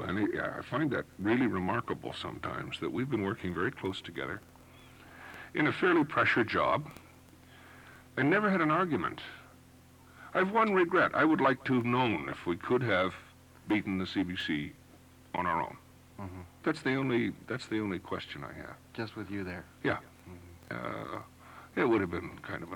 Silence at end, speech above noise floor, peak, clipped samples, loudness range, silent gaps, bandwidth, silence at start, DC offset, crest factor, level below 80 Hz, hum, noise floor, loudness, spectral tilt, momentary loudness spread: 0 s; 26 dB; -16 dBFS; under 0.1%; 8 LU; none; 17.5 kHz; 0 s; under 0.1%; 16 dB; -64 dBFS; none; -57 dBFS; -32 LUFS; -6.5 dB/octave; 19 LU